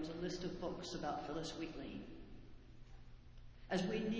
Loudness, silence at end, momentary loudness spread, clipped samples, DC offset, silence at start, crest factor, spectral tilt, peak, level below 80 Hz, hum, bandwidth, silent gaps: -44 LUFS; 0 s; 21 LU; under 0.1%; under 0.1%; 0 s; 20 dB; -5.5 dB/octave; -26 dBFS; -60 dBFS; none; 8 kHz; none